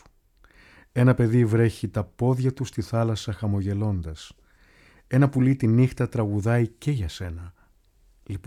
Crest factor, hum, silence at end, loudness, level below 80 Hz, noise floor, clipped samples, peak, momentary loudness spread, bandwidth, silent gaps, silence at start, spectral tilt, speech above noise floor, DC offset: 18 dB; none; 0.05 s; -24 LUFS; -48 dBFS; -59 dBFS; under 0.1%; -6 dBFS; 12 LU; 12 kHz; none; 0.95 s; -8 dB/octave; 37 dB; under 0.1%